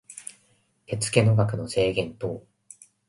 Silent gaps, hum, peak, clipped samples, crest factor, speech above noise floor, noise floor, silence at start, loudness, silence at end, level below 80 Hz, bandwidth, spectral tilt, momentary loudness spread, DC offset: none; none; -4 dBFS; under 0.1%; 22 dB; 42 dB; -65 dBFS; 0.1 s; -25 LUFS; 0.7 s; -54 dBFS; 11.5 kHz; -5.5 dB/octave; 20 LU; under 0.1%